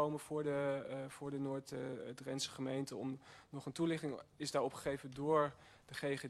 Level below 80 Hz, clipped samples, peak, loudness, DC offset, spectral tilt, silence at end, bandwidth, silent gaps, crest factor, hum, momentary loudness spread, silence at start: -74 dBFS; under 0.1%; -22 dBFS; -41 LUFS; under 0.1%; -5 dB/octave; 0 s; 13 kHz; none; 20 dB; none; 11 LU; 0 s